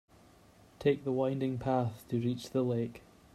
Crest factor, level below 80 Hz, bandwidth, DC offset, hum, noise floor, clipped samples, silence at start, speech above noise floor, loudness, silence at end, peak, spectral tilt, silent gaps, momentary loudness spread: 18 dB; -64 dBFS; 14 kHz; under 0.1%; none; -60 dBFS; under 0.1%; 0.8 s; 28 dB; -33 LUFS; 0.35 s; -16 dBFS; -8 dB/octave; none; 4 LU